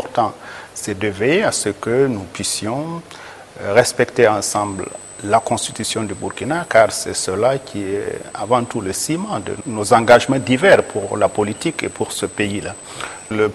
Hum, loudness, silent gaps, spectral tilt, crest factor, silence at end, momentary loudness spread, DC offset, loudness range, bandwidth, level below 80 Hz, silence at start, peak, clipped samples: none; -18 LUFS; none; -4 dB/octave; 18 dB; 0 s; 15 LU; under 0.1%; 4 LU; 13 kHz; -52 dBFS; 0 s; 0 dBFS; under 0.1%